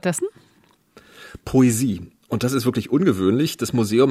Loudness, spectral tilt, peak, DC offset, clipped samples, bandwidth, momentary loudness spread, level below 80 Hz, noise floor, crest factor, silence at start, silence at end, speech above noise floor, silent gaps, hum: -20 LUFS; -6 dB/octave; -4 dBFS; under 0.1%; under 0.1%; 15 kHz; 13 LU; -52 dBFS; -58 dBFS; 16 dB; 0.05 s; 0 s; 39 dB; none; none